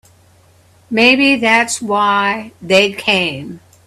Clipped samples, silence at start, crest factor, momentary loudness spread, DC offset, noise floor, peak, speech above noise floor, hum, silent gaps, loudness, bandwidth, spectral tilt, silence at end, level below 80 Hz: under 0.1%; 0.9 s; 16 dB; 12 LU; under 0.1%; -49 dBFS; 0 dBFS; 35 dB; none; none; -13 LUFS; 14 kHz; -3 dB/octave; 0.3 s; -58 dBFS